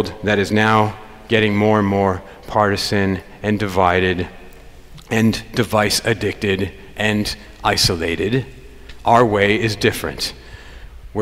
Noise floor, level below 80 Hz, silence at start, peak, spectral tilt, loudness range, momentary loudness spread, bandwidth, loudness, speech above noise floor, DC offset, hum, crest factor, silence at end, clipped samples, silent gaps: -39 dBFS; -40 dBFS; 0 s; 0 dBFS; -5 dB/octave; 2 LU; 10 LU; 16 kHz; -18 LUFS; 22 dB; under 0.1%; none; 18 dB; 0 s; under 0.1%; none